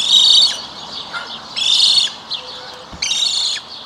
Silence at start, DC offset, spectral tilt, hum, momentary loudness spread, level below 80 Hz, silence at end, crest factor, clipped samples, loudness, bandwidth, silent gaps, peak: 0 s; under 0.1%; 1.5 dB/octave; none; 19 LU; -54 dBFS; 0 s; 16 dB; under 0.1%; -12 LUFS; 16 kHz; none; 0 dBFS